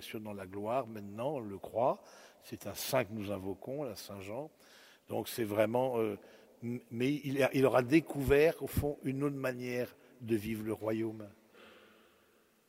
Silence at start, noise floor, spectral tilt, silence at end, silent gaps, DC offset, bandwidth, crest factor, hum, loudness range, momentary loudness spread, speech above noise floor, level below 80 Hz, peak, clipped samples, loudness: 0 s; -69 dBFS; -6 dB/octave; 0.9 s; none; under 0.1%; 16 kHz; 22 dB; none; 8 LU; 16 LU; 34 dB; -58 dBFS; -14 dBFS; under 0.1%; -35 LUFS